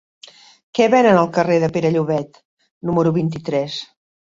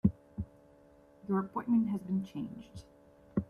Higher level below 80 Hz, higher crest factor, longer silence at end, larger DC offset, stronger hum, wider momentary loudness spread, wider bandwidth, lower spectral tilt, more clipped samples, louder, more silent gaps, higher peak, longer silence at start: about the same, -56 dBFS vs -58 dBFS; second, 16 dB vs 22 dB; first, 0.4 s vs 0.05 s; neither; neither; second, 14 LU vs 19 LU; second, 7.6 kHz vs 10.5 kHz; second, -6.5 dB/octave vs -9.5 dB/octave; neither; first, -17 LUFS vs -35 LUFS; first, 2.45-2.57 s, 2.71-2.81 s vs none; first, -2 dBFS vs -12 dBFS; first, 0.75 s vs 0.05 s